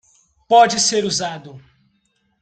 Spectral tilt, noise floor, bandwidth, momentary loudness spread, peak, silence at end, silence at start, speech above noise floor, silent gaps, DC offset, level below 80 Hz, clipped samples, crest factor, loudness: -2 dB/octave; -66 dBFS; 9.4 kHz; 15 LU; -2 dBFS; 0.85 s; 0.5 s; 49 dB; none; under 0.1%; -60 dBFS; under 0.1%; 18 dB; -16 LUFS